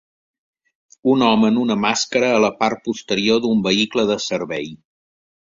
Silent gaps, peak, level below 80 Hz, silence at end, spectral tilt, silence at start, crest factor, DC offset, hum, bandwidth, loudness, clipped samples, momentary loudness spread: none; -2 dBFS; -58 dBFS; 0.7 s; -4 dB/octave; 1.05 s; 18 dB; under 0.1%; none; 7.6 kHz; -18 LUFS; under 0.1%; 9 LU